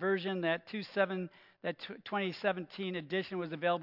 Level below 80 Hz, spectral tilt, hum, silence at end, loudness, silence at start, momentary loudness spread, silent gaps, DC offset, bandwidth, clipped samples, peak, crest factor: -90 dBFS; -7.5 dB/octave; none; 0 s; -36 LUFS; 0 s; 8 LU; none; under 0.1%; 5.8 kHz; under 0.1%; -16 dBFS; 20 dB